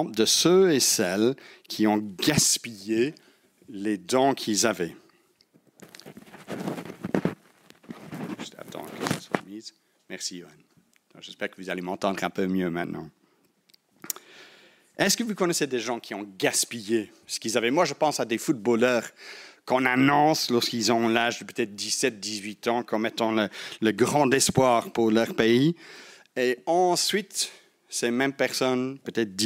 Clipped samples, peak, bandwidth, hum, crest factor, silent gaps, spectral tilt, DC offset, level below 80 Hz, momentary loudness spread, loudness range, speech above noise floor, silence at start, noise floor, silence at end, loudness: under 0.1%; -4 dBFS; 16 kHz; none; 22 dB; none; -3.5 dB/octave; under 0.1%; -66 dBFS; 18 LU; 12 LU; 41 dB; 0 s; -66 dBFS; 0 s; -25 LUFS